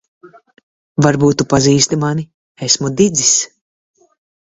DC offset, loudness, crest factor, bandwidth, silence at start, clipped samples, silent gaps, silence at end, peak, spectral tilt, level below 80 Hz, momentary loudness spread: under 0.1%; -13 LUFS; 16 dB; 8 kHz; 0.25 s; under 0.1%; 0.63-0.95 s, 2.34-2.55 s; 1.05 s; 0 dBFS; -4 dB/octave; -46 dBFS; 13 LU